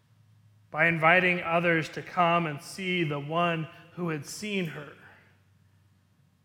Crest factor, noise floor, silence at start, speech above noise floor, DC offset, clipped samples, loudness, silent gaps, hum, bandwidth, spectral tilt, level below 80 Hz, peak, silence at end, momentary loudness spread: 22 dB; -65 dBFS; 0.7 s; 38 dB; under 0.1%; under 0.1%; -27 LUFS; none; none; 17 kHz; -5.5 dB/octave; -70 dBFS; -6 dBFS; 1.35 s; 15 LU